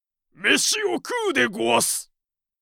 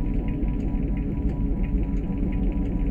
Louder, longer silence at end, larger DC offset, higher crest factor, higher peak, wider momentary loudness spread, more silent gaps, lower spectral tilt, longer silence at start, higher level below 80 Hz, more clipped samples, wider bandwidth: first, -21 LUFS vs -27 LUFS; first, 0.6 s vs 0 s; neither; first, 20 dB vs 12 dB; first, -4 dBFS vs -12 dBFS; first, 7 LU vs 1 LU; neither; second, -1 dB/octave vs -10.5 dB/octave; first, 0.4 s vs 0 s; second, -68 dBFS vs -26 dBFS; neither; first, 18 kHz vs 3.2 kHz